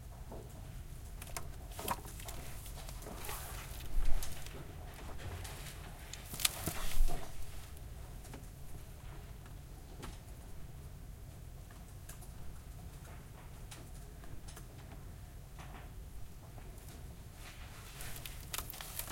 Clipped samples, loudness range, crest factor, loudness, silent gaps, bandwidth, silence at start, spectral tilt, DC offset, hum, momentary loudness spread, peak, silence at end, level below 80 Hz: under 0.1%; 11 LU; 30 dB; -46 LUFS; none; 17 kHz; 0 s; -3 dB/octave; under 0.1%; none; 11 LU; -10 dBFS; 0 s; -44 dBFS